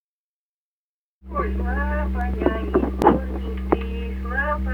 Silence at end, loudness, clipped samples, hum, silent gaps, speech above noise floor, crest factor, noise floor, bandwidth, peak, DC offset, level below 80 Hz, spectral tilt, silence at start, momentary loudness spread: 0 s; -24 LUFS; under 0.1%; none; none; over 69 dB; 22 dB; under -90 dBFS; 6.6 kHz; -2 dBFS; under 0.1%; -28 dBFS; -8.5 dB/octave; 1.25 s; 10 LU